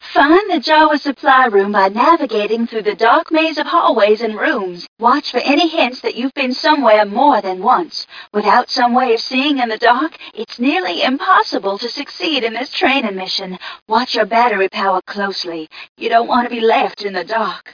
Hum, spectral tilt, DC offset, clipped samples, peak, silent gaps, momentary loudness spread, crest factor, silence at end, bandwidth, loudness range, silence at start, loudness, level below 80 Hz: none; -4.5 dB/octave; under 0.1%; under 0.1%; 0 dBFS; 4.88-4.96 s, 13.82-13.86 s, 15.89-15.95 s; 10 LU; 14 dB; 0.05 s; 5.4 kHz; 4 LU; 0 s; -14 LUFS; -60 dBFS